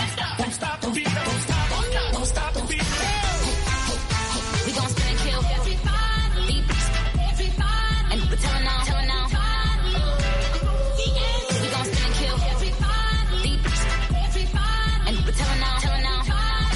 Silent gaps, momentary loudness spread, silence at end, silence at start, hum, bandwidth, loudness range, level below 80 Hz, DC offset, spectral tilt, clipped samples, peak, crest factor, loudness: none; 2 LU; 0 s; 0 s; none; 11.5 kHz; 1 LU; -24 dBFS; under 0.1%; -4 dB/octave; under 0.1%; -10 dBFS; 10 dB; -24 LUFS